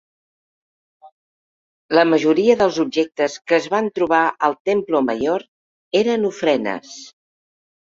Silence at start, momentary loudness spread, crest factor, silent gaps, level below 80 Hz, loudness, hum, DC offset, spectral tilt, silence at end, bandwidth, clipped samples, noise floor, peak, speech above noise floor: 1.05 s; 8 LU; 18 dB; 1.12-1.89 s, 4.60-4.65 s, 5.48-5.91 s; -62 dBFS; -18 LUFS; none; under 0.1%; -5 dB/octave; 0.85 s; 7.8 kHz; under 0.1%; under -90 dBFS; -2 dBFS; over 72 dB